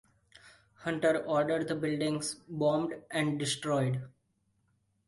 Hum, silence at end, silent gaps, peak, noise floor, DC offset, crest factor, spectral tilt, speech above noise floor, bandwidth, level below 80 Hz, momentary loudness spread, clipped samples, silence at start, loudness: none; 1 s; none; -16 dBFS; -75 dBFS; under 0.1%; 18 dB; -5 dB/octave; 44 dB; 11.5 kHz; -70 dBFS; 8 LU; under 0.1%; 0.45 s; -32 LUFS